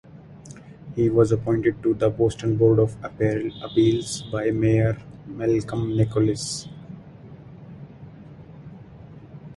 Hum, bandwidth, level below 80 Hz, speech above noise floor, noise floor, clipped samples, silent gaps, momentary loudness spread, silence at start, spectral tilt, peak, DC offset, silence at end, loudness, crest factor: none; 11.5 kHz; -48 dBFS; 22 dB; -43 dBFS; under 0.1%; none; 24 LU; 0.15 s; -7 dB/octave; -4 dBFS; under 0.1%; 0 s; -23 LUFS; 18 dB